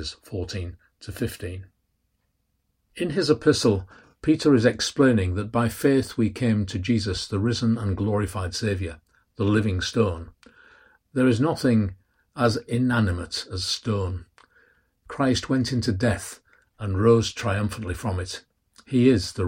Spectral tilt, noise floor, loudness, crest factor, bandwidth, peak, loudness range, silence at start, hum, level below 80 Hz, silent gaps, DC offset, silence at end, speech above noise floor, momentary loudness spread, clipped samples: -6 dB/octave; -73 dBFS; -24 LUFS; 18 dB; 16 kHz; -6 dBFS; 5 LU; 0 s; none; -48 dBFS; none; under 0.1%; 0 s; 50 dB; 14 LU; under 0.1%